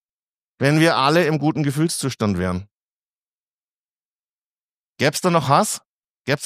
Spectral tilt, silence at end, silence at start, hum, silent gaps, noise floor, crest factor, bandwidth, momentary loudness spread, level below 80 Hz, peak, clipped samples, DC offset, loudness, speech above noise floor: -5 dB/octave; 0 s; 0.6 s; none; 2.71-4.95 s, 5.86-6.20 s; under -90 dBFS; 20 dB; 15.5 kHz; 10 LU; -56 dBFS; -2 dBFS; under 0.1%; under 0.1%; -19 LUFS; over 72 dB